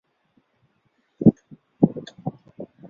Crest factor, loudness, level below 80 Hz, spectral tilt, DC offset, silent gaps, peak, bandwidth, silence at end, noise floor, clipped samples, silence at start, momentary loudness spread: 24 dB; -23 LUFS; -56 dBFS; -10.5 dB/octave; under 0.1%; none; -2 dBFS; 6.8 kHz; 0.25 s; -68 dBFS; under 0.1%; 1.2 s; 23 LU